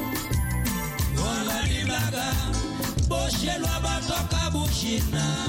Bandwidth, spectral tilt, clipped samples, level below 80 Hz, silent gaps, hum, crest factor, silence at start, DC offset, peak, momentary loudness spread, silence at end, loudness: 17 kHz; -4 dB/octave; under 0.1%; -32 dBFS; none; none; 12 dB; 0 s; under 0.1%; -14 dBFS; 2 LU; 0 s; -26 LUFS